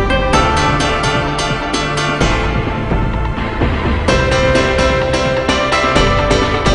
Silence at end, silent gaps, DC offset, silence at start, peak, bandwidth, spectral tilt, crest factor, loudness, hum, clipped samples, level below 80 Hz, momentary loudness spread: 0 s; none; under 0.1%; 0 s; 0 dBFS; 11 kHz; -5 dB/octave; 14 dB; -14 LUFS; none; under 0.1%; -22 dBFS; 5 LU